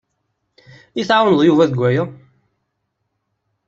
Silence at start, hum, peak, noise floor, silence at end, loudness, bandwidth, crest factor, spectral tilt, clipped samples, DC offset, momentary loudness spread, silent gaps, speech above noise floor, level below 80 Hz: 0.95 s; none; -2 dBFS; -73 dBFS; 1.55 s; -15 LUFS; 7.8 kHz; 18 dB; -7 dB/octave; under 0.1%; under 0.1%; 15 LU; none; 58 dB; -60 dBFS